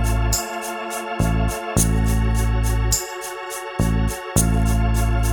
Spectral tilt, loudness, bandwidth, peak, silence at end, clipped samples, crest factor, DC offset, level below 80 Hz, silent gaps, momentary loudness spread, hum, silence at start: -4.5 dB/octave; -21 LUFS; 19.5 kHz; -4 dBFS; 0 s; under 0.1%; 16 dB; under 0.1%; -22 dBFS; none; 8 LU; none; 0 s